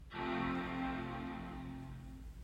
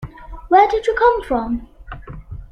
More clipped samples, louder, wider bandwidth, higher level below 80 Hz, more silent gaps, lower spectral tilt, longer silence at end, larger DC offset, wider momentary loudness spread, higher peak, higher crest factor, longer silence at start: neither; second, -42 LUFS vs -16 LUFS; first, 16 kHz vs 11 kHz; second, -54 dBFS vs -36 dBFS; neither; about the same, -7 dB/octave vs -6.5 dB/octave; about the same, 0 s vs 0.05 s; neither; second, 12 LU vs 22 LU; second, -26 dBFS vs -2 dBFS; about the same, 16 dB vs 18 dB; about the same, 0 s vs 0 s